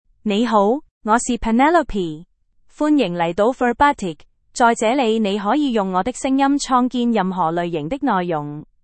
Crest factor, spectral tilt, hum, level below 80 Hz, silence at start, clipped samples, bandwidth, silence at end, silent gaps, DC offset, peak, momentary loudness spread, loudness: 16 dB; -5 dB/octave; none; -44 dBFS; 0.25 s; under 0.1%; 8.8 kHz; 0.2 s; 0.91-1.01 s; under 0.1%; -2 dBFS; 8 LU; -18 LUFS